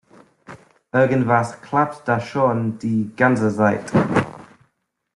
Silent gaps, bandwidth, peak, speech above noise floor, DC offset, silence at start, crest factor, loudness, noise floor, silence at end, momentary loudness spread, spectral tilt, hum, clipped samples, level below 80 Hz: none; 11.5 kHz; -2 dBFS; 52 dB; under 0.1%; 0.5 s; 18 dB; -20 LUFS; -71 dBFS; 0.7 s; 6 LU; -7.5 dB/octave; none; under 0.1%; -54 dBFS